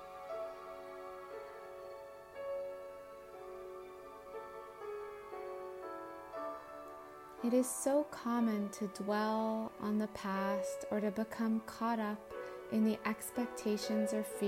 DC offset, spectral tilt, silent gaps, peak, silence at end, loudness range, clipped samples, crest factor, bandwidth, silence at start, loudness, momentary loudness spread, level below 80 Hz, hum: under 0.1%; -5 dB/octave; none; -20 dBFS; 0 s; 12 LU; under 0.1%; 18 dB; 16 kHz; 0 s; -39 LUFS; 15 LU; -72 dBFS; none